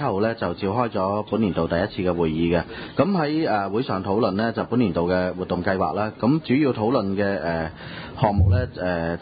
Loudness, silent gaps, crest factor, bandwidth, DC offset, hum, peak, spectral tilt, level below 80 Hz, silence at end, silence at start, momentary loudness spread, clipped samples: -23 LUFS; none; 18 dB; 5 kHz; under 0.1%; none; -4 dBFS; -12 dB/octave; -38 dBFS; 0 s; 0 s; 5 LU; under 0.1%